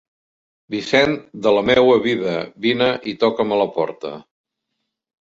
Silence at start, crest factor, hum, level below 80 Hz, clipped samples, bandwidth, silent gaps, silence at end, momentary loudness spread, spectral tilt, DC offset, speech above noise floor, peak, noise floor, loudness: 0.7 s; 18 dB; none; -54 dBFS; under 0.1%; 7.8 kHz; none; 1 s; 14 LU; -5.5 dB/octave; under 0.1%; 59 dB; -2 dBFS; -77 dBFS; -18 LUFS